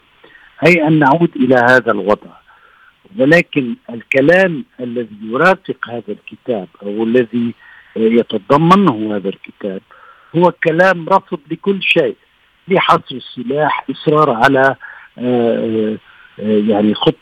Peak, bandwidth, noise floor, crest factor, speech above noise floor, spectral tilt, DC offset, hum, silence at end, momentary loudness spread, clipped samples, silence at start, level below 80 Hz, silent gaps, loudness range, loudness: 0 dBFS; 13.5 kHz; -48 dBFS; 14 dB; 34 dB; -7 dB/octave; under 0.1%; none; 0.1 s; 15 LU; under 0.1%; 0.6 s; -54 dBFS; none; 3 LU; -14 LUFS